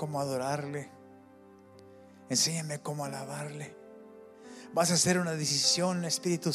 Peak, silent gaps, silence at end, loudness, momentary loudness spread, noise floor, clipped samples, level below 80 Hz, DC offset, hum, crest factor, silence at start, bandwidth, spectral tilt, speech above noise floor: -12 dBFS; none; 0 s; -30 LUFS; 21 LU; -55 dBFS; under 0.1%; -78 dBFS; under 0.1%; none; 20 dB; 0 s; 15 kHz; -3 dB/octave; 25 dB